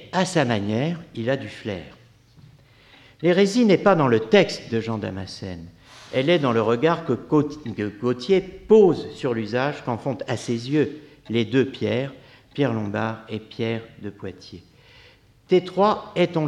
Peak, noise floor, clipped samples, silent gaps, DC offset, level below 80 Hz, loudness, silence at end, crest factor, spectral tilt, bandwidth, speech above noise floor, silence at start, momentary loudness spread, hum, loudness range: -2 dBFS; -53 dBFS; under 0.1%; none; under 0.1%; -58 dBFS; -22 LUFS; 0 s; 20 dB; -6.5 dB/octave; 11.5 kHz; 31 dB; 0 s; 16 LU; none; 6 LU